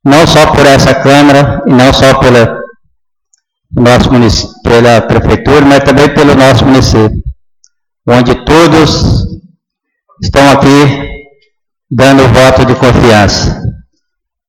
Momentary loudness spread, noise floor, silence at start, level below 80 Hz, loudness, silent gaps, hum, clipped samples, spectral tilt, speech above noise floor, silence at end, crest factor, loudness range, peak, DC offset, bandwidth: 12 LU; -70 dBFS; 0.05 s; -22 dBFS; -5 LUFS; none; none; 1%; -5.5 dB/octave; 66 dB; 0.7 s; 6 dB; 3 LU; 0 dBFS; under 0.1%; 17.5 kHz